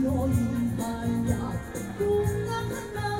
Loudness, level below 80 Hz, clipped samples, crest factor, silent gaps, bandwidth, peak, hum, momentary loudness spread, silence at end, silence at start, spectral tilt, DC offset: -28 LUFS; -42 dBFS; under 0.1%; 16 dB; none; 16 kHz; -12 dBFS; none; 7 LU; 0 s; 0 s; -7 dB/octave; under 0.1%